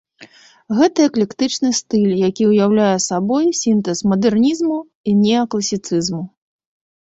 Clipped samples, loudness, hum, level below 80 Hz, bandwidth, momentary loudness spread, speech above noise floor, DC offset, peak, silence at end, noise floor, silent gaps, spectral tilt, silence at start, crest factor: under 0.1%; -16 LUFS; none; -56 dBFS; 8 kHz; 7 LU; 29 dB; under 0.1%; -2 dBFS; 0.75 s; -45 dBFS; 4.95-5.04 s; -5 dB/octave; 0.2 s; 14 dB